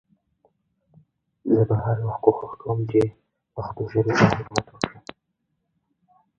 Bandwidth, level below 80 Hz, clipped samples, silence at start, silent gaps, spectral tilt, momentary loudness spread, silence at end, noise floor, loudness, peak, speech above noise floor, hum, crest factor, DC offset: 9 kHz; -52 dBFS; under 0.1%; 1.45 s; none; -7 dB/octave; 16 LU; 1.4 s; -76 dBFS; -23 LUFS; 0 dBFS; 54 dB; none; 24 dB; under 0.1%